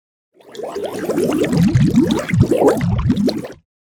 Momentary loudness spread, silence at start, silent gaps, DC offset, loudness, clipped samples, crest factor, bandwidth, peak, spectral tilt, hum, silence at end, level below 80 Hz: 15 LU; 0.5 s; none; under 0.1%; -16 LUFS; under 0.1%; 16 dB; 18.5 kHz; 0 dBFS; -7 dB/octave; none; 0.35 s; -34 dBFS